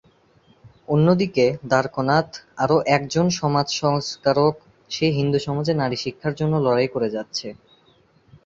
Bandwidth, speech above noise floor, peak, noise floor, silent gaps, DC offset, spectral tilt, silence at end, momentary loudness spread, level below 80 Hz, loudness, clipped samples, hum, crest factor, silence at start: 7.8 kHz; 37 dB; -2 dBFS; -58 dBFS; none; under 0.1%; -6 dB/octave; 0.9 s; 9 LU; -56 dBFS; -21 LUFS; under 0.1%; none; 18 dB; 0.9 s